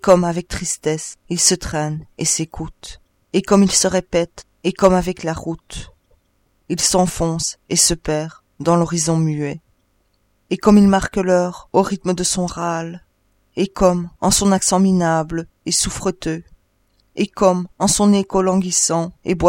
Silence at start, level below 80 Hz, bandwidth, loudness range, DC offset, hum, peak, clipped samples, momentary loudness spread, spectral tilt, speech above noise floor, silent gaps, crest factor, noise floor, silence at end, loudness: 0.05 s; -40 dBFS; 16.5 kHz; 2 LU; under 0.1%; none; 0 dBFS; under 0.1%; 13 LU; -4 dB/octave; 45 dB; none; 18 dB; -63 dBFS; 0 s; -18 LUFS